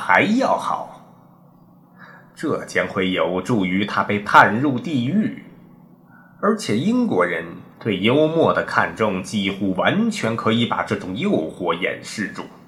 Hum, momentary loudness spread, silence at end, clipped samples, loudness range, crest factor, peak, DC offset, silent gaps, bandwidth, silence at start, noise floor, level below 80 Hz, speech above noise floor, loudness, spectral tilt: none; 11 LU; 0.1 s; under 0.1%; 4 LU; 20 dB; 0 dBFS; under 0.1%; none; 12.5 kHz; 0 s; -50 dBFS; -60 dBFS; 30 dB; -20 LUFS; -5.5 dB/octave